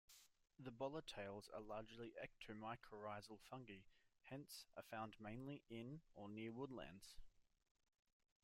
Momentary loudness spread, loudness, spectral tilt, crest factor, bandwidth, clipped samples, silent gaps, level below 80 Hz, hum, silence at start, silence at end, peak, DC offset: 9 LU; -56 LUFS; -5.5 dB/octave; 20 dB; 16 kHz; under 0.1%; none; -76 dBFS; none; 0.1 s; 1 s; -36 dBFS; under 0.1%